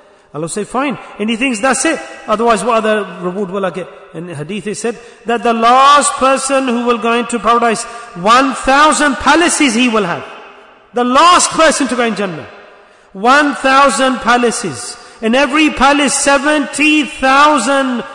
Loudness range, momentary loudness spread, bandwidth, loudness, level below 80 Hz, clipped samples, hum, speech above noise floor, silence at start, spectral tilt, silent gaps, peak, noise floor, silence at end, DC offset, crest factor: 4 LU; 14 LU; 11 kHz; -12 LUFS; -42 dBFS; under 0.1%; none; 30 dB; 0.35 s; -2.5 dB/octave; none; 0 dBFS; -42 dBFS; 0 s; under 0.1%; 12 dB